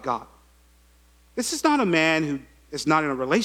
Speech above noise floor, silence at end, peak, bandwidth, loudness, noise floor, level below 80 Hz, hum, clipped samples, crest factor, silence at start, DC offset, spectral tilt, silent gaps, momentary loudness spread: 34 dB; 0 s; -6 dBFS; 16.5 kHz; -23 LUFS; -57 dBFS; -56 dBFS; none; under 0.1%; 20 dB; 0 s; under 0.1%; -4 dB/octave; none; 14 LU